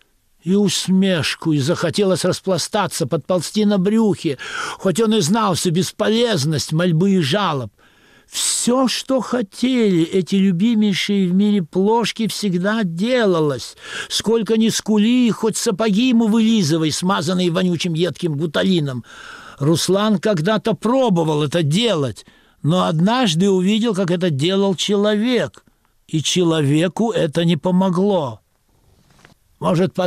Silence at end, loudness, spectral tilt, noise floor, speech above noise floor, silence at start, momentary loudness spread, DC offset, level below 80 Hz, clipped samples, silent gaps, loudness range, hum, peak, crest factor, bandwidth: 0 s; -18 LUFS; -5 dB/octave; -58 dBFS; 41 dB; 0.45 s; 6 LU; under 0.1%; -58 dBFS; under 0.1%; none; 2 LU; none; -8 dBFS; 10 dB; 15 kHz